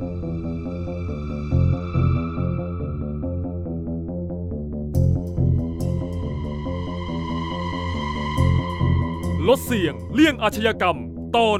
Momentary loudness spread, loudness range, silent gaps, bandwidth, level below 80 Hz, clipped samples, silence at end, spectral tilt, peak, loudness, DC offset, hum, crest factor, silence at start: 9 LU; 5 LU; none; 15.5 kHz; -34 dBFS; under 0.1%; 0 s; -7 dB/octave; -4 dBFS; -24 LUFS; under 0.1%; none; 18 dB; 0 s